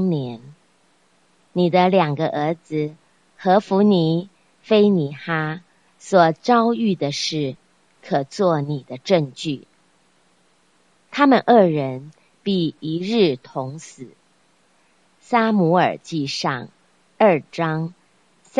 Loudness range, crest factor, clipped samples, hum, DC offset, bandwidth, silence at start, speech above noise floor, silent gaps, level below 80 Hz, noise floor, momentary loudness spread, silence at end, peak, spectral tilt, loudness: 5 LU; 20 dB; under 0.1%; none; under 0.1%; 10.5 kHz; 0 s; 42 dB; none; -68 dBFS; -61 dBFS; 14 LU; 0 s; 0 dBFS; -6.5 dB/octave; -20 LUFS